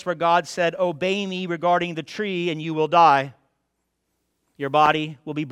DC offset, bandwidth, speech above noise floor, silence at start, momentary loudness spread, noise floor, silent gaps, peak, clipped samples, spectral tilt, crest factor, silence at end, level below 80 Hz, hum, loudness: under 0.1%; 12.5 kHz; 54 dB; 0.05 s; 12 LU; -75 dBFS; none; -4 dBFS; under 0.1%; -5.5 dB/octave; 20 dB; 0 s; -66 dBFS; none; -21 LUFS